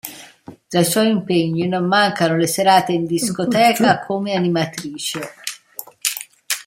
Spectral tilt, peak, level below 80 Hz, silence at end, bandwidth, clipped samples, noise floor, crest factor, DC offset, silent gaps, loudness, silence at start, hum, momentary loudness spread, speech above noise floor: -4 dB/octave; -2 dBFS; -62 dBFS; 0.05 s; 16.5 kHz; under 0.1%; -41 dBFS; 16 dB; under 0.1%; none; -18 LUFS; 0.05 s; none; 14 LU; 24 dB